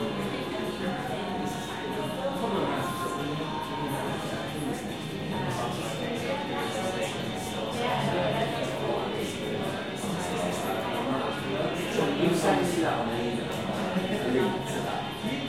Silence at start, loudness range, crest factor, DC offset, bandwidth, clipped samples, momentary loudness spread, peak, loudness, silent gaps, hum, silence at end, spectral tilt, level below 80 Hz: 0 s; 4 LU; 18 dB; 0.2%; 16.5 kHz; under 0.1%; 6 LU; -12 dBFS; -30 LUFS; none; none; 0 s; -5 dB/octave; -56 dBFS